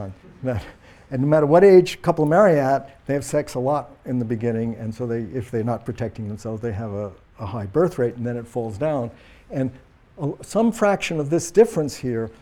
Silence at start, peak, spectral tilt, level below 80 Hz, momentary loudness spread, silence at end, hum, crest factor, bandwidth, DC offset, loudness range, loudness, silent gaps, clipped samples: 0 s; -2 dBFS; -7 dB/octave; -50 dBFS; 15 LU; 0.1 s; none; 18 dB; 16 kHz; under 0.1%; 9 LU; -21 LUFS; none; under 0.1%